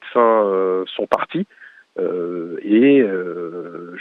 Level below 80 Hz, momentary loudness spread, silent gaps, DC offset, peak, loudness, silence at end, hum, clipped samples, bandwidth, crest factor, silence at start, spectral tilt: -70 dBFS; 17 LU; none; under 0.1%; -2 dBFS; -18 LUFS; 0 s; none; under 0.1%; 6 kHz; 16 dB; 0 s; -8 dB/octave